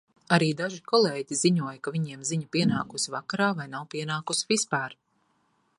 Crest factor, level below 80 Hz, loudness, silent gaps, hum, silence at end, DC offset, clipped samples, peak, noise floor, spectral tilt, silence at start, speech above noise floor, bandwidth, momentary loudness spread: 24 dB; -68 dBFS; -27 LUFS; none; none; 0.85 s; under 0.1%; under 0.1%; -4 dBFS; -70 dBFS; -4 dB/octave; 0.3 s; 43 dB; 11.5 kHz; 9 LU